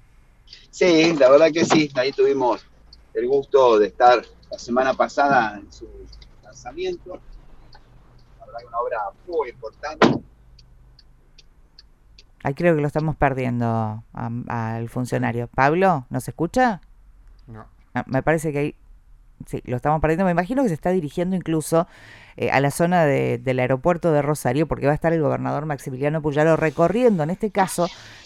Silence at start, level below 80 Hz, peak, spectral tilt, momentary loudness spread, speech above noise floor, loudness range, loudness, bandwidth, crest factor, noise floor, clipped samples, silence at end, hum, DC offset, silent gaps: 0.5 s; -46 dBFS; -2 dBFS; -6 dB/octave; 15 LU; 31 dB; 8 LU; -21 LUFS; 15.5 kHz; 20 dB; -51 dBFS; under 0.1%; 0.05 s; none; under 0.1%; none